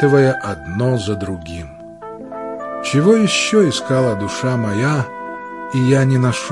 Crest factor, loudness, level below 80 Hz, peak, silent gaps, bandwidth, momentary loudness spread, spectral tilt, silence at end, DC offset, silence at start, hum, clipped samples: 16 dB; -17 LUFS; -50 dBFS; 0 dBFS; none; 11.5 kHz; 17 LU; -5.5 dB/octave; 0 s; 0.1%; 0 s; none; under 0.1%